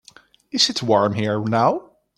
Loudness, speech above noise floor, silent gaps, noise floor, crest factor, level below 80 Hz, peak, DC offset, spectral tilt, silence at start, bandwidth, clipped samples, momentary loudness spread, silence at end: -20 LUFS; 32 dB; none; -51 dBFS; 18 dB; -62 dBFS; -2 dBFS; under 0.1%; -4.5 dB/octave; 0.55 s; 14.5 kHz; under 0.1%; 8 LU; 0.35 s